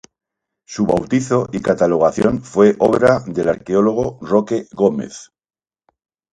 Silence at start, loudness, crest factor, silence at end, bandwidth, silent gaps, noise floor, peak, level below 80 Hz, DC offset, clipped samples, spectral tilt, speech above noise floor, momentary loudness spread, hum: 0.7 s; -17 LUFS; 16 dB; 1.1 s; 10.5 kHz; none; -66 dBFS; 0 dBFS; -48 dBFS; under 0.1%; under 0.1%; -6.5 dB/octave; 50 dB; 9 LU; none